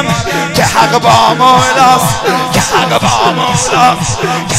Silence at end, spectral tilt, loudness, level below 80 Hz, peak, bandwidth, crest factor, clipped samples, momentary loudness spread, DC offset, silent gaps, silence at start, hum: 0 s; -3.5 dB/octave; -9 LUFS; -34 dBFS; 0 dBFS; 16.5 kHz; 10 dB; 0.4%; 6 LU; under 0.1%; none; 0 s; none